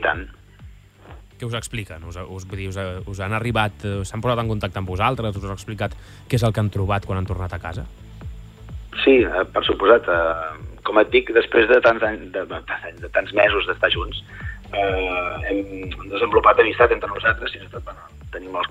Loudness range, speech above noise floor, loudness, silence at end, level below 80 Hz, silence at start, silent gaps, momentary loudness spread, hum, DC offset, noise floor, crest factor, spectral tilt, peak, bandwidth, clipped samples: 8 LU; 23 dB; -20 LUFS; 0 s; -38 dBFS; 0 s; none; 19 LU; none; under 0.1%; -44 dBFS; 20 dB; -6 dB/octave; -2 dBFS; 14.5 kHz; under 0.1%